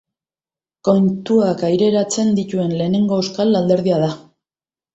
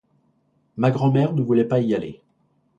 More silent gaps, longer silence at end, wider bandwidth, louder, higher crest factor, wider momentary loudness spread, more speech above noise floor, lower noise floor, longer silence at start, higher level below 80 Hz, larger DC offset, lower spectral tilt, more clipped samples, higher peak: neither; about the same, 0.75 s vs 0.65 s; first, 8.2 kHz vs 7.4 kHz; first, -17 LUFS vs -21 LUFS; about the same, 16 dB vs 18 dB; second, 4 LU vs 12 LU; first, over 74 dB vs 45 dB; first, under -90 dBFS vs -65 dBFS; about the same, 0.85 s vs 0.75 s; about the same, -58 dBFS vs -60 dBFS; neither; second, -6.5 dB/octave vs -9.5 dB/octave; neither; about the same, -2 dBFS vs -4 dBFS